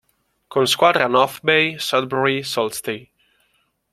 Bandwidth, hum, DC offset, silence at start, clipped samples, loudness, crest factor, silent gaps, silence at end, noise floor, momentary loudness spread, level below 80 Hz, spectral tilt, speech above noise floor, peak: 16 kHz; none; under 0.1%; 0.5 s; under 0.1%; -18 LUFS; 20 dB; none; 0.9 s; -66 dBFS; 11 LU; -62 dBFS; -3.5 dB/octave; 47 dB; 0 dBFS